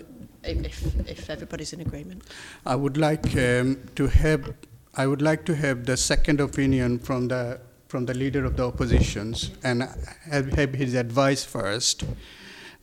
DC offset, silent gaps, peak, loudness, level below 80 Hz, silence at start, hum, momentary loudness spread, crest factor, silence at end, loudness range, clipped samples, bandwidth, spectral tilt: under 0.1%; none; -6 dBFS; -25 LUFS; -32 dBFS; 0 s; none; 16 LU; 20 dB; 0.1 s; 3 LU; under 0.1%; 16 kHz; -5 dB/octave